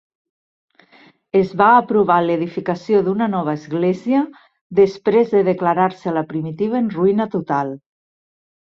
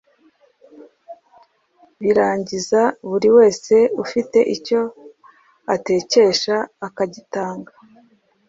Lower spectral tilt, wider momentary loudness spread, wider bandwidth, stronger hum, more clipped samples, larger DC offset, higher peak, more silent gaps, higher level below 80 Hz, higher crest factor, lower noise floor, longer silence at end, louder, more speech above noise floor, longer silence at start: first, -8.5 dB/octave vs -4 dB/octave; second, 9 LU vs 13 LU; second, 7 kHz vs 7.8 kHz; neither; neither; neither; about the same, -2 dBFS vs -2 dBFS; first, 4.61-4.70 s vs none; about the same, -60 dBFS vs -62 dBFS; about the same, 16 dB vs 18 dB; second, -51 dBFS vs -57 dBFS; about the same, 0.9 s vs 0.85 s; about the same, -18 LUFS vs -18 LUFS; second, 34 dB vs 40 dB; first, 1.35 s vs 1.1 s